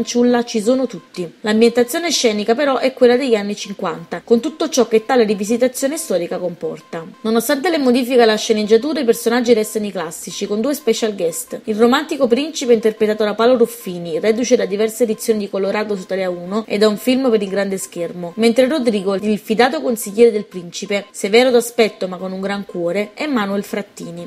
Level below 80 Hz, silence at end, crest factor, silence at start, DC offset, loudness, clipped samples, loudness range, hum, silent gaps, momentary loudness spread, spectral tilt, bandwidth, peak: -62 dBFS; 0 s; 16 dB; 0 s; under 0.1%; -17 LUFS; under 0.1%; 2 LU; none; none; 11 LU; -4 dB/octave; 16 kHz; 0 dBFS